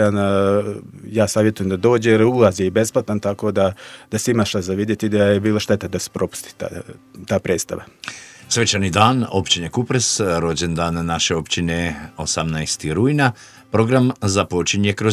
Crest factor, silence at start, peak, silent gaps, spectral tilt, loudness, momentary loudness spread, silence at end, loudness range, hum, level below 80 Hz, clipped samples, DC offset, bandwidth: 18 dB; 0 s; 0 dBFS; none; -4.5 dB/octave; -19 LUFS; 13 LU; 0 s; 3 LU; none; -40 dBFS; under 0.1%; under 0.1%; 15.5 kHz